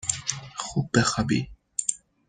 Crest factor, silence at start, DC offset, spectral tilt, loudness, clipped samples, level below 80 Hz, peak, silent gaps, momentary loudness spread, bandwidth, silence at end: 22 dB; 0 s; under 0.1%; -3.5 dB/octave; -27 LUFS; under 0.1%; -50 dBFS; -4 dBFS; none; 8 LU; 10 kHz; 0.3 s